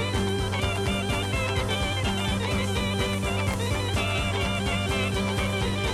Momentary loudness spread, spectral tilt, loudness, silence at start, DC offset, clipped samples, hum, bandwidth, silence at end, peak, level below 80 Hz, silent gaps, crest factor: 1 LU; -4.5 dB/octave; -26 LUFS; 0 s; under 0.1%; under 0.1%; none; 14.5 kHz; 0 s; -14 dBFS; -36 dBFS; none; 12 dB